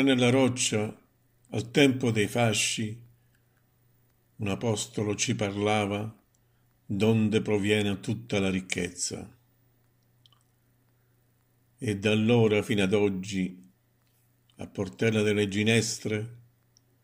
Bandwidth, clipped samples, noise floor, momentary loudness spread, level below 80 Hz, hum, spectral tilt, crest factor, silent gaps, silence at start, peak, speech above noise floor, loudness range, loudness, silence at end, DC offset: 16 kHz; under 0.1%; -68 dBFS; 13 LU; -68 dBFS; none; -4.5 dB/octave; 22 dB; none; 0 s; -6 dBFS; 41 dB; 6 LU; -27 LUFS; 0.65 s; under 0.1%